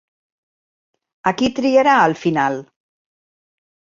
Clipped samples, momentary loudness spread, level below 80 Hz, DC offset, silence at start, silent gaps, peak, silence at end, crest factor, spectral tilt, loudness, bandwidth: under 0.1%; 9 LU; -58 dBFS; under 0.1%; 1.25 s; none; -2 dBFS; 1.35 s; 18 dB; -5.5 dB/octave; -16 LUFS; 7.6 kHz